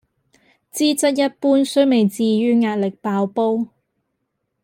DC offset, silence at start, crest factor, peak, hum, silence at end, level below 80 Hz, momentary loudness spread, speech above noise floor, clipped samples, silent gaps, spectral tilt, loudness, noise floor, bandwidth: under 0.1%; 0.75 s; 16 dB; -4 dBFS; none; 1 s; -70 dBFS; 7 LU; 57 dB; under 0.1%; none; -5 dB/octave; -18 LUFS; -74 dBFS; 16.5 kHz